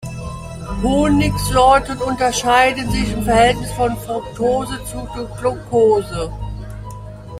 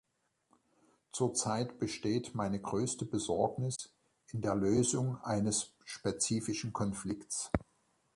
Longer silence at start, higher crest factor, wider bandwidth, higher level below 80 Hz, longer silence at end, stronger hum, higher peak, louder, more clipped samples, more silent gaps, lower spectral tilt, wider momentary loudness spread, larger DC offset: second, 0 s vs 1.15 s; second, 16 dB vs 24 dB; first, 16 kHz vs 11.5 kHz; first, -30 dBFS vs -58 dBFS; second, 0 s vs 0.55 s; neither; first, 0 dBFS vs -12 dBFS; first, -17 LUFS vs -35 LUFS; neither; neither; about the same, -5 dB/octave vs -5 dB/octave; first, 16 LU vs 8 LU; neither